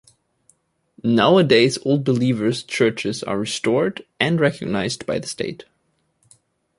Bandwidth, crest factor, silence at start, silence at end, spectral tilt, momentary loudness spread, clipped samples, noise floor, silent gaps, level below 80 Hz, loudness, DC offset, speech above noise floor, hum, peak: 11.5 kHz; 18 dB; 1.05 s; 1.15 s; -5.5 dB/octave; 11 LU; under 0.1%; -67 dBFS; none; -58 dBFS; -20 LUFS; under 0.1%; 48 dB; none; -2 dBFS